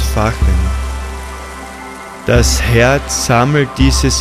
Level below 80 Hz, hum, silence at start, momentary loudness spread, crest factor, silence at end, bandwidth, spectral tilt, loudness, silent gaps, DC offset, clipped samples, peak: -18 dBFS; none; 0 s; 17 LU; 12 dB; 0 s; 15.5 kHz; -4.5 dB/octave; -13 LUFS; none; under 0.1%; under 0.1%; 0 dBFS